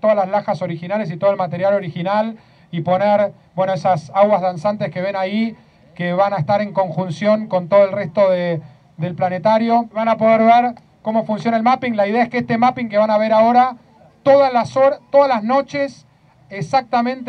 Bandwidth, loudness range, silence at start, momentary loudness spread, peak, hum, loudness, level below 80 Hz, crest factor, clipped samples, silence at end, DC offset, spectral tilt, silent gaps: 8.8 kHz; 4 LU; 0.05 s; 10 LU; 0 dBFS; none; -17 LUFS; -62 dBFS; 16 dB; under 0.1%; 0 s; under 0.1%; -7.5 dB/octave; none